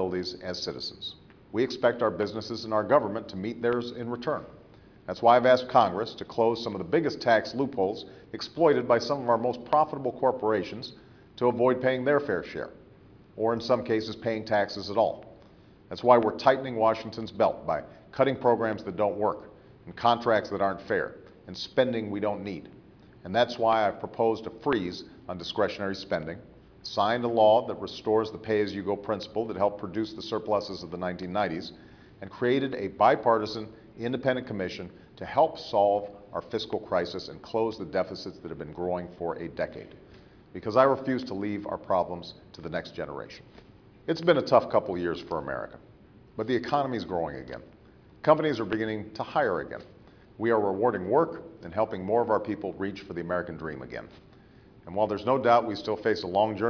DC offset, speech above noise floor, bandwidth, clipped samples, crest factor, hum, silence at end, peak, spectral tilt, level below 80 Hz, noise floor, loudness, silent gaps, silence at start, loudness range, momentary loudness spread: under 0.1%; 27 dB; 5.4 kHz; under 0.1%; 22 dB; none; 0 s; -6 dBFS; -6.5 dB/octave; -60 dBFS; -54 dBFS; -28 LUFS; none; 0 s; 5 LU; 16 LU